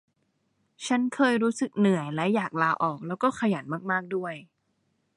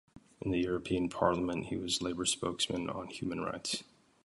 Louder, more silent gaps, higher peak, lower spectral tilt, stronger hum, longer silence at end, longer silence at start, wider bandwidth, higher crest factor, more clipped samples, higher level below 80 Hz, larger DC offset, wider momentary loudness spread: first, -26 LUFS vs -34 LUFS; neither; about the same, -10 dBFS vs -12 dBFS; first, -6 dB/octave vs -4 dB/octave; neither; first, 0.7 s vs 0.4 s; first, 0.8 s vs 0.15 s; about the same, 11.5 kHz vs 11.5 kHz; about the same, 18 dB vs 22 dB; neither; second, -74 dBFS vs -58 dBFS; neither; about the same, 9 LU vs 8 LU